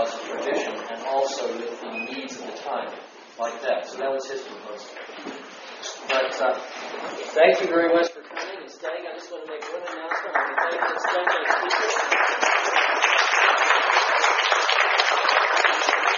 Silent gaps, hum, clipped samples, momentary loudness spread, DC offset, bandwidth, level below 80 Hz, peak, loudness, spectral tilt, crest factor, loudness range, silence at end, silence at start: none; none; under 0.1%; 17 LU; under 0.1%; 7.2 kHz; -82 dBFS; -2 dBFS; -22 LUFS; 2 dB/octave; 22 dB; 12 LU; 0 s; 0 s